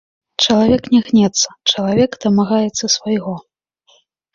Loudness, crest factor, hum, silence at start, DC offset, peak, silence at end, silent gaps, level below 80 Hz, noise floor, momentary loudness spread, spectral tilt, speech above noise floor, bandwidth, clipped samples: -15 LUFS; 16 dB; none; 0.4 s; under 0.1%; -2 dBFS; 0.95 s; none; -46 dBFS; -56 dBFS; 8 LU; -4 dB/octave; 41 dB; 7.6 kHz; under 0.1%